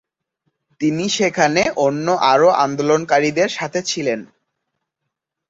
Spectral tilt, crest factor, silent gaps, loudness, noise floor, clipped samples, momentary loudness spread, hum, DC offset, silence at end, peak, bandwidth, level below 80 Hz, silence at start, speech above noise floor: -4 dB/octave; 18 dB; none; -17 LUFS; -79 dBFS; under 0.1%; 8 LU; none; under 0.1%; 1.25 s; -2 dBFS; 7.8 kHz; -58 dBFS; 0.8 s; 62 dB